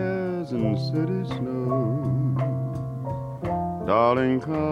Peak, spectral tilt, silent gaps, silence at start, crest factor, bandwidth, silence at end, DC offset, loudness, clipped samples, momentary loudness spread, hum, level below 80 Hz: -8 dBFS; -9 dB/octave; none; 0 s; 18 dB; 6.2 kHz; 0 s; under 0.1%; -25 LUFS; under 0.1%; 10 LU; none; -50 dBFS